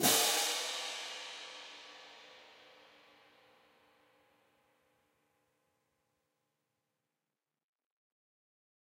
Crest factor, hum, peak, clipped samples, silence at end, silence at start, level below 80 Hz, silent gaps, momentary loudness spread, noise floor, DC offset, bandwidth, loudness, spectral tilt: 28 dB; none; -14 dBFS; under 0.1%; 6.4 s; 0 s; -90 dBFS; none; 27 LU; under -90 dBFS; under 0.1%; 16 kHz; -34 LUFS; -0.5 dB/octave